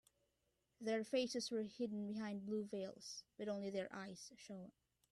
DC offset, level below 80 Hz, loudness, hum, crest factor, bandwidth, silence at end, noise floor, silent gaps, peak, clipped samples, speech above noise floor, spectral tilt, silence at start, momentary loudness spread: under 0.1%; -84 dBFS; -46 LUFS; none; 18 dB; 12.5 kHz; 0.4 s; -85 dBFS; none; -28 dBFS; under 0.1%; 40 dB; -4.5 dB/octave; 0.8 s; 14 LU